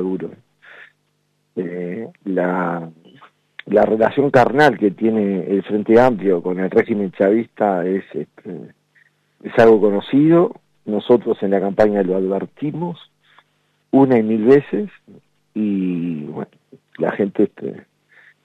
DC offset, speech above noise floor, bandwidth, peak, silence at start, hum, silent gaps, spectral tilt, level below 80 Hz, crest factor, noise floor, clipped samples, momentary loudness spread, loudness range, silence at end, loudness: under 0.1%; 49 dB; 8.4 kHz; -2 dBFS; 0 s; 50 Hz at -45 dBFS; none; -8.5 dB/octave; -58 dBFS; 16 dB; -66 dBFS; under 0.1%; 18 LU; 8 LU; 0.65 s; -17 LUFS